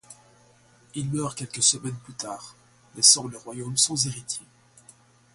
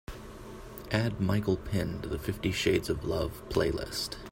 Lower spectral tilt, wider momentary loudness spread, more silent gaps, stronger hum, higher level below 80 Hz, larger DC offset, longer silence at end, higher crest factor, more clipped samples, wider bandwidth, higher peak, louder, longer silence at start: second, -2 dB/octave vs -5.5 dB/octave; first, 20 LU vs 17 LU; neither; neither; second, -66 dBFS vs -46 dBFS; neither; first, 0.95 s vs 0 s; first, 26 dB vs 20 dB; neither; second, 12 kHz vs 16.5 kHz; first, -2 dBFS vs -12 dBFS; first, -22 LUFS vs -31 LUFS; about the same, 0.1 s vs 0.1 s